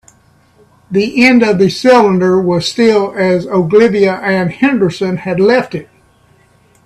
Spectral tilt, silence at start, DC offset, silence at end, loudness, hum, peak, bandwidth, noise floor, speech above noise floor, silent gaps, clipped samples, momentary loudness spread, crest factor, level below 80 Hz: -6 dB/octave; 0.9 s; under 0.1%; 1 s; -11 LUFS; none; 0 dBFS; 12.5 kHz; -49 dBFS; 39 dB; none; under 0.1%; 7 LU; 12 dB; -50 dBFS